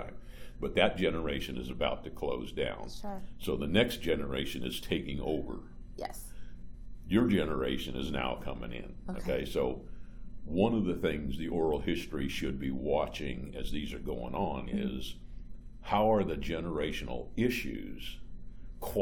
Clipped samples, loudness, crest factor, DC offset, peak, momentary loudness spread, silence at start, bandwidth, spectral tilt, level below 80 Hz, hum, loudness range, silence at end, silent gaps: under 0.1%; -34 LUFS; 22 dB; under 0.1%; -12 dBFS; 21 LU; 0 s; 19 kHz; -6 dB/octave; -44 dBFS; none; 2 LU; 0 s; none